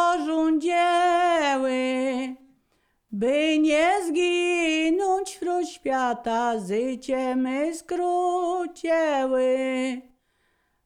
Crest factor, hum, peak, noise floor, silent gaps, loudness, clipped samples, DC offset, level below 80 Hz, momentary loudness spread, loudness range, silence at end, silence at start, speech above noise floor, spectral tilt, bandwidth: 14 dB; none; -10 dBFS; -69 dBFS; none; -24 LUFS; under 0.1%; under 0.1%; -62 dBFS; 7 LU; 3 LU; 0.85 s; 0 s; 46 dB; -3.5 dB/octave; 13.5 kHz